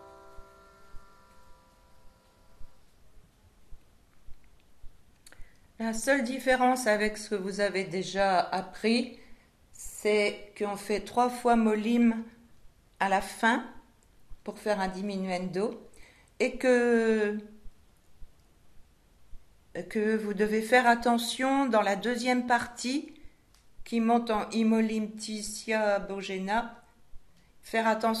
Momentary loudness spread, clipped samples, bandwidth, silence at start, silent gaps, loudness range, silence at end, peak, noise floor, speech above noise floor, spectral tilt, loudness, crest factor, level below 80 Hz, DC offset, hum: 11 LU; under 0.1%; 13.5 kHz; 0 s; none; 6 LU; 0 s; -8 dBFS; -61 dBFS; 33 dB; -4.5 dB/octave; -28 LUFS; 22 dB; -56 dBFS; under 0.1%; none